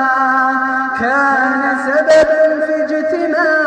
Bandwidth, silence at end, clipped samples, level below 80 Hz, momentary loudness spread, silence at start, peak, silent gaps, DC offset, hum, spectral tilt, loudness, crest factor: 9.6 kHz; 0 s; under 0.1%; -52 dBFS; 6 LU; 0 s; 0 dBFS; none; under 0.1%; none; -4 dB/octave; -13 LUFS; 12 dB